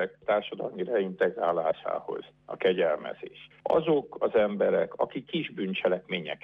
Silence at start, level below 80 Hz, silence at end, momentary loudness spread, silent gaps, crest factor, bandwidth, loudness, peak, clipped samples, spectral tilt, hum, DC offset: 0 s; -70 dBFS; 0.05 s; 13 LU; none; 16 dB; 5 kHz; -29 LUFS; -12 dBFS; under 0.1%; -8 dB/octave; none; under 0.1%